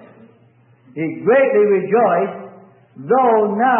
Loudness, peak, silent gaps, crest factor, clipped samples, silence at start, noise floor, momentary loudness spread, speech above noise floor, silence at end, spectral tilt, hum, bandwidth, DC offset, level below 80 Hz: -16 LUFS; -4 dBFS; none; 14 dB; under 0.1%; 0.95 s; -52 dBFS; 18 LU; 37 dB; 0 s; -12 dB/octave; none; 3.5 kHz; under 0.1%; -74 dBFS